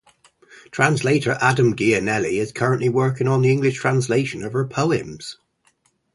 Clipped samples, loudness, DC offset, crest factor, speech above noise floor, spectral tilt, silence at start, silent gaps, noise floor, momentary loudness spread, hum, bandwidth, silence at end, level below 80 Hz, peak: under 0.1%; -20 LUFS; under 0.1%; 20 dB; 44 dB; -6 dB/octave; 0.55 s; none; -64 dBFS; 7 LU; none; 11.5 kHz; 0.8 s; -56 dBFS; 0 dBFS